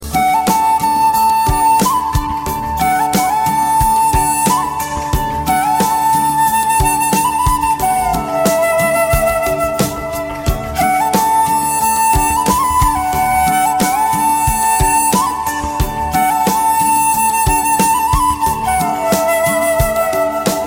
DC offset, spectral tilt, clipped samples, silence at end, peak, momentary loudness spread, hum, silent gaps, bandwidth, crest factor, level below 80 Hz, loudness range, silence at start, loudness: under 0.1%; -3.5 dB/octave; under 0.1%; 0 s; -2 dBFS; 6 LU; none; none; 17 kHz; 12 dB; -28 dBFS; 2 LU; 0 s; -14 LUFS